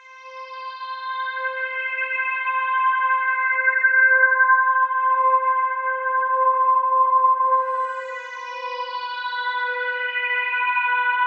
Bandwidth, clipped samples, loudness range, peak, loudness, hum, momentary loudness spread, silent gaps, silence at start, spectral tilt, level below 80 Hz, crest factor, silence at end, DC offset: 6.2 kHz; under 0.1%; 6 LU; -6 dBFS; -20 LUFS; none; 15 LU; none; 0.05 s; 4.5 dB/octave; under -90 dBFS; 14 dB; 0 s; under 0.1%